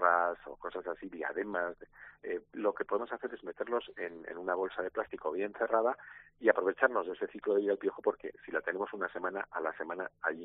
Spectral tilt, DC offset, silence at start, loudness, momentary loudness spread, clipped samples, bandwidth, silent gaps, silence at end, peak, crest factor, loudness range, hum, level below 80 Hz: -8 dB/octave; under 0.1%; 0 s; -35 LUFS; 12 LU; under 0.1%; 4 kHz; none; 0 s; -10 dBFS; 24 dB; 5 LU; none; -72 dBFS